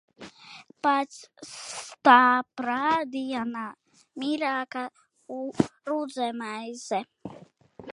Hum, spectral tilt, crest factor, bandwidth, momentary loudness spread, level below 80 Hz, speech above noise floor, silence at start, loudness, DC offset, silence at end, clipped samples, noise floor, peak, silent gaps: none; -4 dB/octave; 24 dB; 11.5 kHz; 24 LU; -68 dBFS; 24 dB; 0.2 s; -26 LUFS; under 0.1%; 0.05 s; under 0.1%; -50 dBFS; -2 dBFS; none